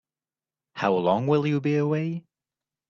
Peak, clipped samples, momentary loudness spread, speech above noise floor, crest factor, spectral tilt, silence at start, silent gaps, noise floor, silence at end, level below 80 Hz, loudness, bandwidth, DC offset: -8 dBFS; under 0.1%; 11 LU; over 67 dB; 18 dB; -8 dB/octave; 0.75 s; none; under -90 dBFS; 0.7 s; -68 dBFS; -24 LUFS; 7 kHz; under 0.1%